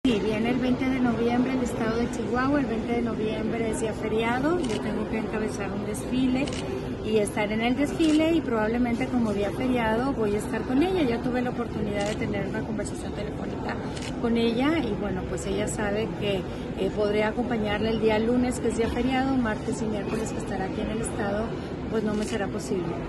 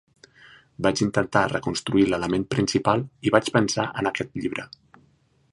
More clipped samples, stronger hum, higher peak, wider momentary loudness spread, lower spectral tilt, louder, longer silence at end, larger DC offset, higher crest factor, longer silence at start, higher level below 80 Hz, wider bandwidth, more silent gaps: neither; neither; second, -12 dBFS vs -2 dBFS; about the same, 6 LU vs 8 LU; about the same, -6 dB/octave vs -5 dB/octave; second, -27 LUFS vs -24 LUFS; second, 0 s vs 0.85 s; neither; second, 14 dB vs 24 dB; second, 0.05 s vs 0.8 s; first, -42 dBFS vs -52 dBFS; about the same, 12.5 kHz vs 11.5 kHz; neither